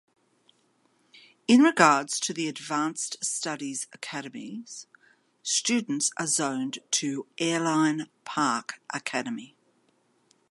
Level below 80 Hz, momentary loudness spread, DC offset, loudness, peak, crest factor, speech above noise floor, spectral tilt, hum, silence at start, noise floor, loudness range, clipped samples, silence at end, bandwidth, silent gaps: -82 dBFS; 16 LU; under 0.1%; -26 LUFS; -2 dBFS; 26 dB; 41 dB; -2.5 dB/octave; none; 1.5 s; -68 dBFS; 6 LU; under 0.1%; 1.05 s; 11.5 kHz; none